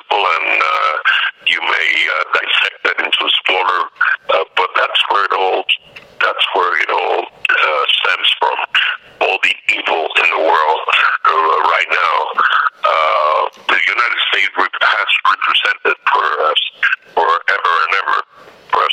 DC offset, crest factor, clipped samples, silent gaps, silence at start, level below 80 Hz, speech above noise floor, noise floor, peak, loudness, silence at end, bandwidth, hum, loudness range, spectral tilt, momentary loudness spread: under 0.1%; 14 dB; under 0.1%; none; 0.1 s; -66 dBFS; 26 dB; -41 dBFS; 0 dBFS; -13 LUFS; 0 s; 15.5 kHz; none; 2 LU; -0.5 dB/octave; 4 LU